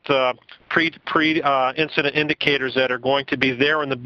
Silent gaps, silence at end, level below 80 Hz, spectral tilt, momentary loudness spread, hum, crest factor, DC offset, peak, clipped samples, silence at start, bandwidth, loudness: none; 0 s; -58 dBFS; -6 dB/octave; 3 LU; none; 20 dB; under 0.1%; 0 dBFS; under 0.1%; 0.05 s; 6.8 kHz; -20 LUFS